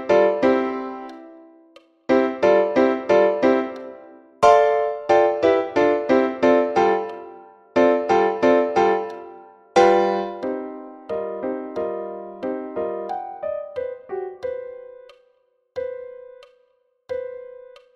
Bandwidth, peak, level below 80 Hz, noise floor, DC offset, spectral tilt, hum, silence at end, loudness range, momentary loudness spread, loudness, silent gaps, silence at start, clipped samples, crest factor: 9.2 kHz; 0 dBFS; -60 dBFS; -64 dBFS; under 0.1%; -5.5 dB/octave; none; 0.4 s; 14 LU; 19 LU; -20 LUFS; none; 0 s; under 0.1%; 20 dB